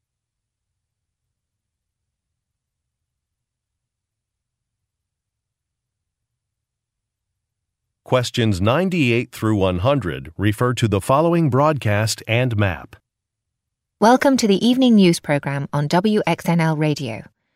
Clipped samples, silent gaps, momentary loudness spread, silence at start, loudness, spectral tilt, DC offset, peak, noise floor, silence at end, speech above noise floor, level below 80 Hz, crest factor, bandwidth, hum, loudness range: under 0.1%; none; 8 LU; 8.1 s; -18 LUFS; -6 dB/octave; under 0.1%; -2 dBFS; -82 dBFS; 0.35 s; 64 dB; -52 dBFS; 18 dB; 16 kHz; none; 6 LU